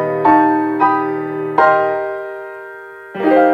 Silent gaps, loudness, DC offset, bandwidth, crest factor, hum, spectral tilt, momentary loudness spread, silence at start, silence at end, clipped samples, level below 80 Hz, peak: none; -15 LUFS; under 0.1%; 5.6 kHz; 14 dB; none; -8 dB/octave; 18 LU; 0 s; 0 s; under 0.1%; -62 dBFS; 0 dBFS